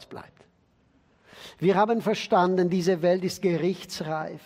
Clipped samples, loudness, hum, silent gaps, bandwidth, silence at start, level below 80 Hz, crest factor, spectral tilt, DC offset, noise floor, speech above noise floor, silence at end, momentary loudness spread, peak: under 0.1%; -25 LUFS; none; none; 16 kHz; 0 s; -68 dBFS; 18 dB; -6 dB/octave; under 0.1%; -64 dBFS; 40 dB; 0.1 s; 21 LU; -8 dBFS